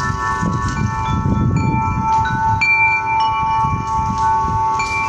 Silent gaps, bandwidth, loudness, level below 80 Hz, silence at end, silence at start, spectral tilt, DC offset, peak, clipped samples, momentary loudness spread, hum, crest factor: none; 10 kHz; -16 LUFS; -30 dBFS; 0 s; 0 s; -5.5 dB/octave; under 0.1%; -4 dBFS; under 0.1%; 6 LU; none; 12 dB